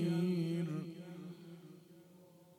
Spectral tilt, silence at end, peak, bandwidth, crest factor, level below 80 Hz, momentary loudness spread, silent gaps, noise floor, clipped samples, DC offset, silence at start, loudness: -8 dB/octave; 0.05 s; -26 dBFS; 14 kHz; 14 dB; -84 dBFS; 24 LU; none; -62 dBFS; under 0.1%; under 0.1%; 0 s; -39 LUFS